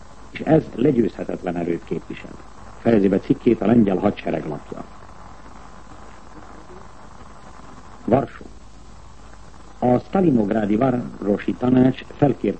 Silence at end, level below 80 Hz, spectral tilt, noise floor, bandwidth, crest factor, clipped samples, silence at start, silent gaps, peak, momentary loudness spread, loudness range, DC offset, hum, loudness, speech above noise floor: 0 s; -46 dBFS; -8.5 dB/octave; -43 dBFS; 8.6 kHz; 18 dB; under 0.1%; 0.25 s; none; -2 dBFS; 23 LU; 13 LU; 0.9%; none; -20 LUFS; 24 dB